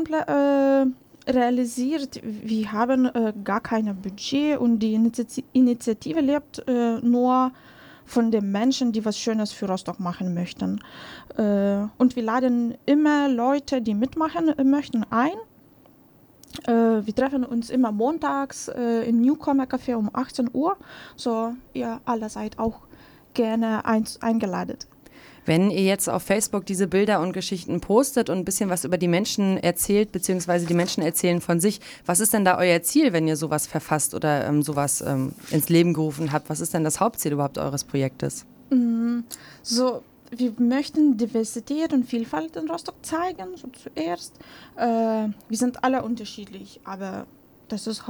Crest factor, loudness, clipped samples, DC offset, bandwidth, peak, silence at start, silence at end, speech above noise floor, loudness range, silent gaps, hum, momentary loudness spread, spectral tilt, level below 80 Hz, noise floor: 18 dB; -23 LUFS; under 0.1%; under 0.1%; over 20 kHz; -6 dBFS; 0 s; 0 s; 31 dB; 5 LU; none; none; 11 LU; -5 dB/octave; -58 dBFS; -54 dBFS